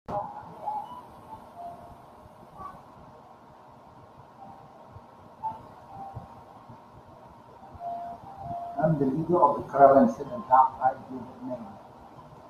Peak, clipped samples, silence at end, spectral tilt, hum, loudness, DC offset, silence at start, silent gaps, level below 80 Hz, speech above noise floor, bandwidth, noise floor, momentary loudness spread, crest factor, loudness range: -4 dBFS; under 0.1%; 0.1 s; -9 dB/octave; none; -26 LUFS; under 0.1%; 0.1 s; none; -62 dBFS; 28 dB; 7.2 kHz; -51 dBFS; 27 LU; 26 dB; 24 LU